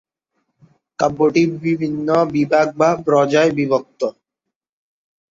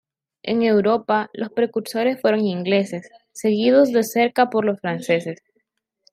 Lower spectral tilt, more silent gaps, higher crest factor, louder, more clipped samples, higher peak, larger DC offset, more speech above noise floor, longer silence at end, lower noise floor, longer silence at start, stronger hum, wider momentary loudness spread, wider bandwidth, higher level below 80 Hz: about the same, -6.5 dB/octave vs -5.5 dB/octave; neither; about the same, 16 dB vs 18 dB; first, -17 LUFS vs -20 LUFS; neither; about the same, -2 dBFS vs -4 dBFS; neither; first, 66 dB vs 53 dB; first, 1.2 s vs 0.8 s; first, -82 dBFS vs -73 dBFS; first, 1 s vs 0.45 s; neither; second, 6 LU vs 12 LU; second, 7.6 kHz vs 15.5 kHz; first, -58 dBFS vs -68 dBFS